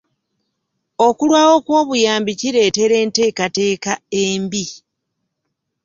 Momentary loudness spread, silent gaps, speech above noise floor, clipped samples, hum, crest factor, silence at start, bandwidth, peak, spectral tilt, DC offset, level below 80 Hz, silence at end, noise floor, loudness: 9 LU; none; 60 dB; under 0.1%; none; 16 dB; 1 s; 7.6 kHz; 0 dBFS; -3.5 dB/octave; under 0.1%; -60 dBFS; 1.1 s; -75 dBFS; -16 LUFS